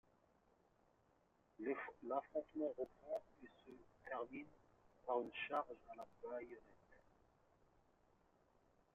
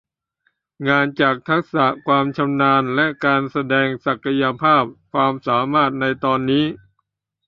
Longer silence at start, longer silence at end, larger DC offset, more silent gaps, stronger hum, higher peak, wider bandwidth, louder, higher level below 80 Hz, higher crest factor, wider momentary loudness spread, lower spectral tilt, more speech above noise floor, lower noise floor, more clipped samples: first, 1.6 s vs 0.8 s; first, 1.95 s vs 0.7 s; neither; neither; neither; second, -28 dBFS vs -2 dBFS; first, 7.2 kHz vs 6 kHz; second, -48 LUFS vs -18 LUFS; second, -82 dBFS vs -58 dBFS; about the same, 22 dB vs 18 dB; first, 18 LU vs 5 LU; second, -2.5 dB/octave vs -8 dB/octave; second, 30 dB vs 55 dB; first, -78 dBFS vs -73 dBFS; neither